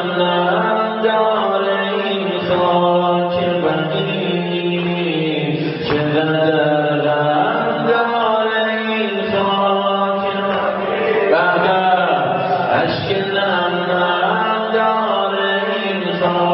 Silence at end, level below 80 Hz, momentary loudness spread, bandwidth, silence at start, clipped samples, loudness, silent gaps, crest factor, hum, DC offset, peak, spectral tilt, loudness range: 0 s; -56 dBFS; 4 LU; 5.8 kHz; 0 s; under 0.1%; -17 LUFS; none; 16 dB; none; under 0.1%; -2 dBFS; -10.5 dB/octave; 2 LU